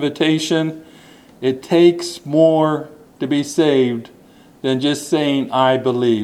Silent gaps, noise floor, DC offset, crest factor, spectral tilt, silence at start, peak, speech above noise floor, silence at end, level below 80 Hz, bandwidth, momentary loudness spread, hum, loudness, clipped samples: none; -46 dBFS; under 0.1%; 16 dB; -5.5 dB/octave; 0 s; -2 dBFS; 30 dB; 0 s; -64 dBFS; 13.5 kHz; 12 LU; none; -17 LUFS; under 0.1%